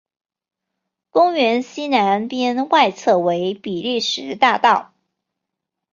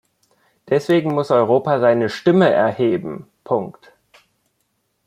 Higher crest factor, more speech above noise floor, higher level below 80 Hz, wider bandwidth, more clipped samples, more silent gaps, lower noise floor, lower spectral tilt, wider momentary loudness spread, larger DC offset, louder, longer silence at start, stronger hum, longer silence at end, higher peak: about the same, 18 dB vs 16 dB; first, 64 dB vs 52 dB; second, -68 dBFS vs -62 dBFS; second, 7.6 kHz vs 12 kHz; neither; neither; first, -81 dBFS vs -69 dBFS; second, -4 dB/octave vs -7.5 dB/octave; second, 7 LU vs 10 LU; neither; about the same, -18 LUFS vs -17 LUFS; first, 1.15 s vs 0.65 s; neither; second, 1.1 s vs 1.35 s; about the same, -2 dBFS vs -2 dBFS